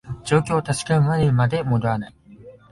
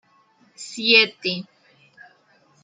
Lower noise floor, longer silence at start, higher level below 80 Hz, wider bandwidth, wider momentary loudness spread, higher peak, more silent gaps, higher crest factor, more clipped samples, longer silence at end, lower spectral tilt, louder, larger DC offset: second, -45 dBFS vs -59 dBFS; second, 0.05 s vs 0.6 s; first, -46 dBFS vs -78 dBFS; first, 11.5 kHz vs 9.4 kHz; second, 7 LU vs 21 LU; about the same, -2 dBFS vs -2 dBFS; neither; about the same, 18 dB vs 22 dB; neither; second, 0.2 s vs 1.2 s; first, -6.5 dB/octave vs -2.5 dB/octave; second, -21 LUFS vs -18 LUFS; neither